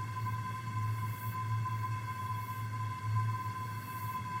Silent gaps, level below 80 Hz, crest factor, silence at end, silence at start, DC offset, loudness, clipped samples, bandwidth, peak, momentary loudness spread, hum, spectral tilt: none; -64 dBFS; 14 dB; 0 s; 0 s; under 0.1%; -37 LUFS; under 0.1%; 16.5 kHz; -22 dBFS; 5 LU; none; -6 dB/octave